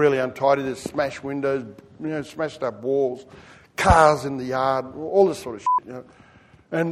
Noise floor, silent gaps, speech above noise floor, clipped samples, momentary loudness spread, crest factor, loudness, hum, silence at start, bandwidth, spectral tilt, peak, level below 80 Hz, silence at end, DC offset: -52 dBFS; none; 30 dB; under 0.1%; 13 LU; 20 dB; -22 LUFS; none; 0 s; 14 kHz; -5.5 dB/octave; -2 dBFS; -40 dBFS; 0 s; under 0.1%